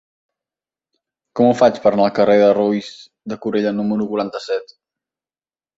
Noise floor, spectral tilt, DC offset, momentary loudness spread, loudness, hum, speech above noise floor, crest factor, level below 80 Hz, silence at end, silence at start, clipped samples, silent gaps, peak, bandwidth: under -90 dBFS; -6.5 dB/octave; under 0.1%; 15 LU; -17 LUFS; none; over 74 dB; 18 dB; -60 dBFS; 1.15 s; 1.35 s; under 0.1%; none; -2 dBFS; 7.8 kHz